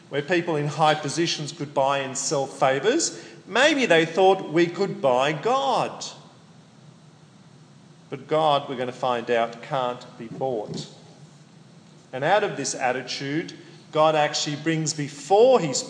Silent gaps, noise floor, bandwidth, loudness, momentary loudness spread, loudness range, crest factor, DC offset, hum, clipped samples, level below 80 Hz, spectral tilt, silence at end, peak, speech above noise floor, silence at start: none; -51 dBFS; 10.5 kHz; -23 LUFS; 12 LU; 8 LU; 18 dB; under 0.1%; none; under 0.1%; -78 dBFS; -4 dB/octave; 0 s; -6 dBFS; 28 dB; 0.1 s